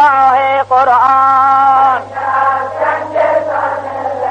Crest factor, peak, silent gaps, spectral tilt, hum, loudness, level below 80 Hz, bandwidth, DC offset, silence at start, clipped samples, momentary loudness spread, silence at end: 10 dB; -2 dBFS; none; -5 dB/octave; 50 Hz at -40 dBFS; -11 LUFS; -56 dBFS; 8.8 kHz; under 0.1%; 0 s; under 0.1%; 8 LU; 0 s